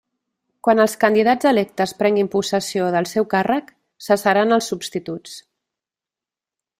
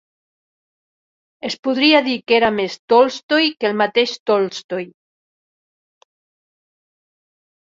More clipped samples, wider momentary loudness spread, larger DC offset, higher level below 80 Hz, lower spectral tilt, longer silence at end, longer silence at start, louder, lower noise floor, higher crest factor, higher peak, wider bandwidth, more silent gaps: neither; about the same, 13 LU vs 14 LU; neither; about the same, -62 dBFS vs -64 dBFS; about the same, -4.5 dB/octave vs -4 dB/octave; second, 1.4 s vs 2.75 s; second, 0.65 s vs 1.45 s; about the same, -19 LUFS vs -17 LUFS; about the same, -89 dBFS vs under -90 dBFS; about the same, 18 dB vs 20 dB; about the same, -2 dBFS vs -2 dBFS; first, 16 kHz vs 7.8 kHz; second, none vs 1.59-1.63 s, 2.79-2.88 s, 3.23-3.29 s, 4.20-4.26 s, 4.64-4.69 s